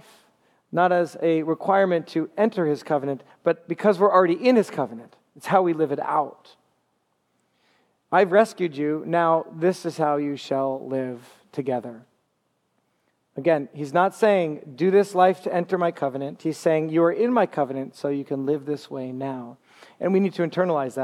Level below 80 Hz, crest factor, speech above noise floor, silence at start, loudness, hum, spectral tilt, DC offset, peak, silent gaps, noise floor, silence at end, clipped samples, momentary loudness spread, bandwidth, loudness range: -80 dBFS; 20 dB; 49 dB; 0.7 s; -23 LUFS; none; -7 dB/octave; under 0.1%; -4 dBFS; none; -72 dBFS; 0 s; under 0.1%; 11 LU; 13.5 kHz; 6 LU